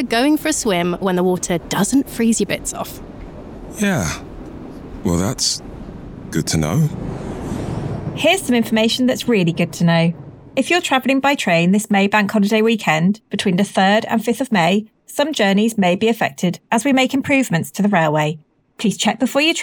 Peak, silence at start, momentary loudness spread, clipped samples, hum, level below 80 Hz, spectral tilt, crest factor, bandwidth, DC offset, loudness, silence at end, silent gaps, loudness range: -4 dBFS; 0 s; 13 LU; under 0.1%; none; -42 dBFS; -4.5 dB/octave; 14 dB; over 20 kHz; under 0.1%; -17 LUFS; 0 s; none; 6 LU